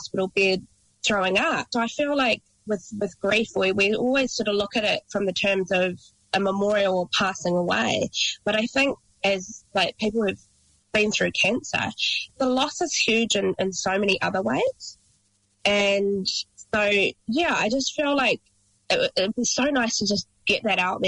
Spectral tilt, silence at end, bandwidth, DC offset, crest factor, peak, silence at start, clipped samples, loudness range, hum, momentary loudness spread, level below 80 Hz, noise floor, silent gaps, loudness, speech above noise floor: -3 dB/octave; 0 s; 11 kHz; under 0.1%; 14 dB; -10 dBFS; 0 s; under 0.1%; 2 LU; none; 7 LU; -58 dBFS; -66 dBFS; none; -23 LUFS; 43 dB